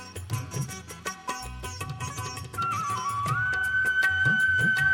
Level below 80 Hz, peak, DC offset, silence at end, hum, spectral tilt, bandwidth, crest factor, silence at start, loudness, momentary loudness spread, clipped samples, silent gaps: -50 dBFS; -12 dBFS; under 0.1%; 0 s; none; -3.5 dB/octave; 17 kHz; 14 dB; 0 s; -27 LUFS; 14 LU; under 0.1%; none